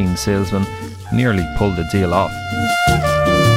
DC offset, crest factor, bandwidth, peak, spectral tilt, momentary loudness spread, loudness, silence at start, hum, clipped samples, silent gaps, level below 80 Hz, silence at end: under 0.1%; 14 dB; 16.5 kHz; -2 dBFS; -5.5 dB/octave; 7 LU; -17 LUFS; 0 s; none; under 0.1%; none; -32 dBFS; 0 s